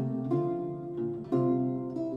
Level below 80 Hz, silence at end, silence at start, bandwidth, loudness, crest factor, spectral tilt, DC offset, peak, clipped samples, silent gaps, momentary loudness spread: -66 dBFS; 0 s; 0 s; 5.2 kHz; -31 LUFS; 14 dB; -11.5 dB/octave; under 0.1%; -16 dBFS; under 0.1%; none; 7 LU